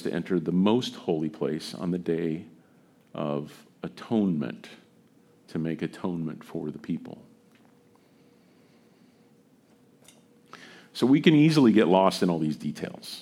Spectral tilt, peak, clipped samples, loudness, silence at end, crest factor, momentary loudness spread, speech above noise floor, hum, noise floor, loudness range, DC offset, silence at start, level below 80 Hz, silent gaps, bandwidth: -7 dB/octave; -6 dBFS; under 0.1%; -26 LUFS; 0 s; 22 dB; 21 LU; 34 dB; none; -60 dBFS; 15 LU; under 0.1%; 0 s; -68 dBFS; none; 15.5 kHz